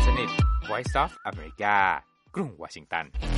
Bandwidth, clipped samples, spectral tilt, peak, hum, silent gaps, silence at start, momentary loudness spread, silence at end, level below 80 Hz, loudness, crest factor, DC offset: 11 kHz; under 0.1%; -5.5 dB/octave; -8 dBFS; none; none; 0 s; 14 LU; 0 s; -30 dBFS; -27 LUFS; 20 dB; under 0.1%